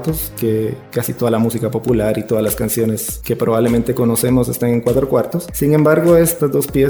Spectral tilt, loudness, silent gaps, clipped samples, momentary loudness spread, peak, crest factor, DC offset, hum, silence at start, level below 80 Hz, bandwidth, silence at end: -6 dB/octave; -16 LUFS; none; under 0.1%; 9 LU; -2 dBFS; 14 dB; under 0.1%; none; 0 s; -36 dBFS; over 20 kHz; 0 s